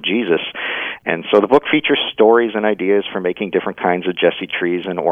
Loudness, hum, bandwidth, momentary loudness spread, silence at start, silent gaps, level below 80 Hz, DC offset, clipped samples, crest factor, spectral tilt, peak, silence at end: -17 LUFS; none; 4.5 kHz; 9 LU; 0 s; none; -60 dBFS; under 0.1%; under 0.1%; 16 dB; -7 dB/octave; 0 dBFS; 0 s